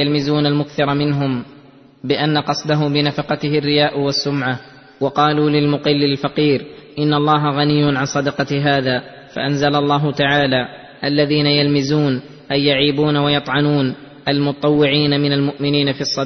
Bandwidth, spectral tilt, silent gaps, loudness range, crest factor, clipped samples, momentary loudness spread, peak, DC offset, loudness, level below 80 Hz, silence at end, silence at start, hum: 6.4 kHz; -6 dB/octave; none; 2 LU; 14 dB; under 0.1%; 7 LU; -2 dBFS; under 0.1%; -17 LUFS; -52 dBFS; 0 s; 0 s; none